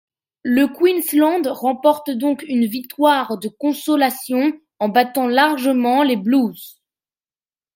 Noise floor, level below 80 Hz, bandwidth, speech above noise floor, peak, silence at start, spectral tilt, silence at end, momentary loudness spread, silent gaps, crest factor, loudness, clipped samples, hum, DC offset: under -90 dBFS; -70 dBFS; 16.5 kHz; over 73 dB; -2 dBFS; 0.45 s; -4 dB/octave; 1.05 s; 7 LU; none; 16 dB; -18 LUFS; under 0.1%; none; under 0.1%